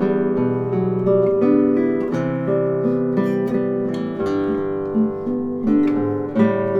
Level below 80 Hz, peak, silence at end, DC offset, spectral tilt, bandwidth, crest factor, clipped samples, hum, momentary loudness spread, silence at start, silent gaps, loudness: -54 dBFS; -4 dBFS; 0 s; under 0.1%; -9.5 dB/octave; 6.8 kHz; 14 dB; under 0.1%; none; 6 LU; 0 s; none; -20 LUFS